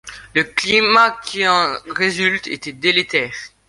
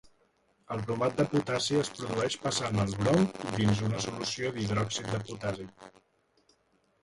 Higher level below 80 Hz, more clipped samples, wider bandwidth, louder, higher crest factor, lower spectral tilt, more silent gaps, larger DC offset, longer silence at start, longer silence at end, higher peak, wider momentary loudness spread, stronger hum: about the same, -54 dBFS vs -58 dBFS; neither; about the same, 11.5 kHz vs 11.5 kHz; first, -16 LUFS vs -30 LUFS; about the same, 18 dB vs 20 dB; second, -3 dB/octave vs -5 dB/octave; neither; neither; second, 0.05 s vs 0.7 s; second, 0.2 s vs 1.15 s; first, 0 dBFS vs -12 dBFS; about the same, 8 LU vs 9 LU; neither